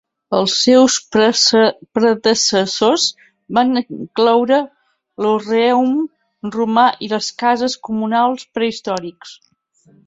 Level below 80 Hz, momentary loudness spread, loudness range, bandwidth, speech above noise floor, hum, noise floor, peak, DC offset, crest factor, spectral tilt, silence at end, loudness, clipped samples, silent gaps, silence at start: -60 dBFS; 10 LU; 4 LU; 8 kHz; 39 dB; none; -54 dBFS; -2 dBFS; under 0.1%; 14 dB; -3 dB/octave; 0.75 s; -15 LUFS; under 0.1%; none; 0.3 s